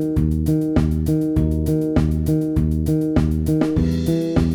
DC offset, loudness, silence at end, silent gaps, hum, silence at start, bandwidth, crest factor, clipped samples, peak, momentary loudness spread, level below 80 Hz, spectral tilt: under 0.1%; -19 LUFS; 0 s; none; none; 0 s; 19 kHz; 14 dB; under 0.1%; -4 dBFS; 1 LU; -26 dBFS; -8.5 dB/octave